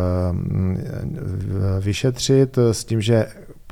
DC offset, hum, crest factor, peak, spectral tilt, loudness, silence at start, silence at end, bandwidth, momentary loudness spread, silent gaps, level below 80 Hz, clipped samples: under 0.1%; none; 16 dB; -4 dBFS; -6.5 dB/octave; -21 LUFS; 0 s; 0 s; 15 kHz; 10 LU; none; -42 dBFS; under 0.1%